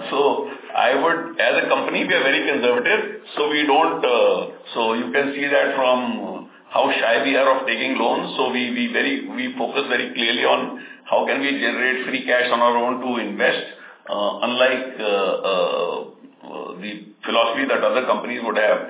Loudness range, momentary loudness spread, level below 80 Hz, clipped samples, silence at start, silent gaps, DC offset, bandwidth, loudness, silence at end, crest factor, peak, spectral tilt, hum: 4 LU; 12 LU; -82 dBFS; under 0.1%; 0 s; none; under 0.1%; 4 kHz; -20 LUFS; 0 s; 18 dB; -2 dBFS; -7.5 dB/octave; none